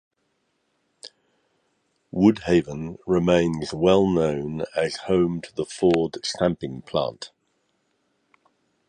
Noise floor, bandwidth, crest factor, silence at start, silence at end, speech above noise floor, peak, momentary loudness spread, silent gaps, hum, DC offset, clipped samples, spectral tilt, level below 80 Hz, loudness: -72 dBFS; 10 kHz; 20 dB; 1.05 s; 1.6 s; 50 dB; -4 dBFS; 16 LU; none; none; under 0.1%; under 0.1%; -6.5 dB/octave; -50 dBFS; -23 LUFS